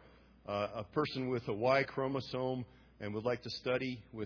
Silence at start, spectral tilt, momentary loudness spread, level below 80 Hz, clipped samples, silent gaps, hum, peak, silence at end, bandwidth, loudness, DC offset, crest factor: 0 s; -4.5 dB/octave; 11 LU; -66 dBFS; under 0.1%; none; none; -16 dBFS; 0 s; 5.4 kHz; -36 LUFS; under 0.1%; 20 dB